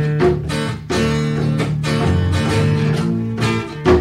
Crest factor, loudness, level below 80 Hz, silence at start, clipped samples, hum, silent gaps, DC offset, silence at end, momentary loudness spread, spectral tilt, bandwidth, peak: 14 dB; -18 LUFS; -34 dBFS; 0 s; under 0.1%; none; none; under 0.1%; 0 s; 4 LU; -6.5 dB/octave; 12.5 kHz; -2 dBFS